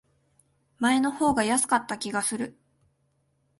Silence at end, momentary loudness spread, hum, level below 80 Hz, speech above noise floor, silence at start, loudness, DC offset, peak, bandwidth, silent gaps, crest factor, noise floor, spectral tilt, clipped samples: 1.1 s; 8 LU; none; -60 dBFS; 46 dB; 0.8 s; -25 LUFS; under 0.1%; -8 dBFS; 12 kHz; none; 20 dB; -71 dBFS; -3 dB/octave; under 0.1%